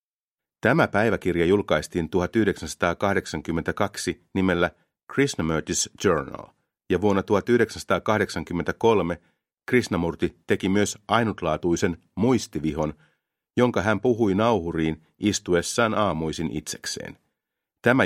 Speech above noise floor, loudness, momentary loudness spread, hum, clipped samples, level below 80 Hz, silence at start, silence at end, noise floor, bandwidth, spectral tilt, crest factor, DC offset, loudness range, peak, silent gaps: over 66 dB; -24 LUFS; 8 LU; none; under 0.1%; -50 dBFS; 0.65 s; 0 s; under -90 dBFS; 15.5 kHz; -5 dB/octave; 20 dB; under 0.1%; 2 LU; -4 dBFS; 5.03-5.07 s